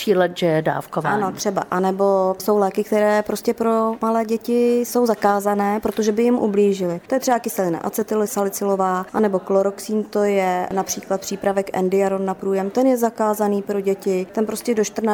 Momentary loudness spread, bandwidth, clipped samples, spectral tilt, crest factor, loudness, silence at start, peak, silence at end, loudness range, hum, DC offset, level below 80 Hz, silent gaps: 5 LU; 20 kHz; under 0.1%; -5.5 dB/octave; 14 dB; -20 LUFS; 0 s; -4 dBFS; 0 s; 2 LU; none; under 0.1%; -58 dBFS; none